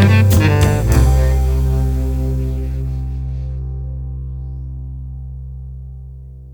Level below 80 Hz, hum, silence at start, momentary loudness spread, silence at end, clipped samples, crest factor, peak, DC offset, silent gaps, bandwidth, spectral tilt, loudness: -20 dBFS; none; 0 s; 19 LU; 0 s; under 0.1%; 14 dB; -2 dBFS; under 0.1%; none; 19.5 kHz; -6.5 dB/octave; -17 LUFS